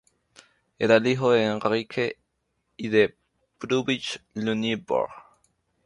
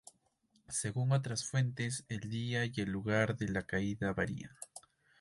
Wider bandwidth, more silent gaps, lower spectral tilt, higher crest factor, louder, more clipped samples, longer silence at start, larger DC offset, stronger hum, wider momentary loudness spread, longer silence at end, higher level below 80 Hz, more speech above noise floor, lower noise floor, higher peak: about the same, 11 kHz vs 11.5 kHz; neither; about the same, -5.5 dB/octave vs -5 dB/octave; about the same, 20 dB vs 20 dB; first, -25 LUFS vs -36 LUFS; neither; about the same, 0.8 s vs 0.7 s; neither; neither; about the same, 12 LU vs 11 LU; first, 0.65 s vs 0.4 s; about the same, -64 dBFS vs -60 dBFS; first, 52 dB vs 39 dB; about the same, -75 dBFS vs -74 dBFS; first, -6 dBFS vs -18 dBFS